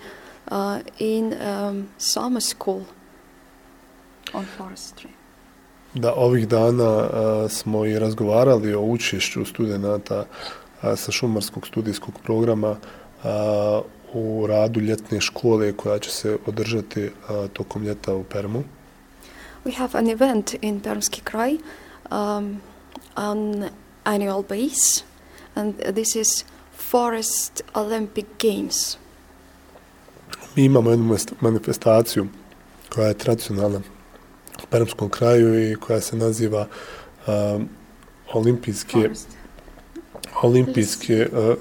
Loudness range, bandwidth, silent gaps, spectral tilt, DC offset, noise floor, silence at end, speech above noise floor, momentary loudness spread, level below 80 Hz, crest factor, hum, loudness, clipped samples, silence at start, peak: 6 LU; 19 kHz; none; -5 dB/octave; under 0.1%; -50 dBFS; 0 s; 29 dB; 16 LU; -54 dBFS; 20 dB; none; -22 LUFS; under 0.1%; 0 s; -2 dBFS